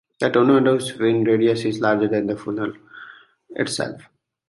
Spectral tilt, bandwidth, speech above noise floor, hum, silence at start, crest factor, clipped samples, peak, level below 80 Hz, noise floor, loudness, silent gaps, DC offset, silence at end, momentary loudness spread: -5.5 dB/octave; 11.5 kHz; 25 dB; none; 0.2 s; 16 dB; under 0.1%; -4 dBFS; -62 dBFS; -45 dBFS; -20 LUFS; none; under 0.1%; 0.5 s; 16 LU